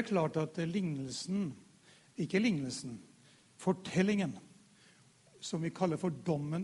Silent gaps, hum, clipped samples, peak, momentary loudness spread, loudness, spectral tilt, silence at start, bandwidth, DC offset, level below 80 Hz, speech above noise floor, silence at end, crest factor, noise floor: none; none; under 0.1%; -16 dBFS; 15 LU; -35 LUFS; -6 dB/octave; 0 s; 11.5 kHz; under 0.1%; -72 dBFS; 29 dB; 0 s; 20 dB; -64 dBFS